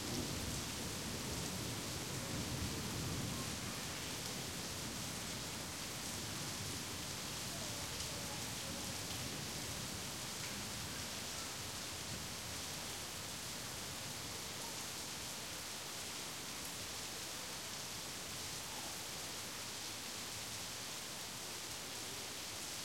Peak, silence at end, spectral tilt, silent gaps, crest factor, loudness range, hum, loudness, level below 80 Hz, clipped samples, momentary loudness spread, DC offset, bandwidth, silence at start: -26 dBFS; 0 s; -2.5 dB/octave; none; 18 dB; 2 LU; none; -43 LUFS; -62 dBFS; under 0.1%; 3 LU; under 0.1%; 16.5 kHz; 0 s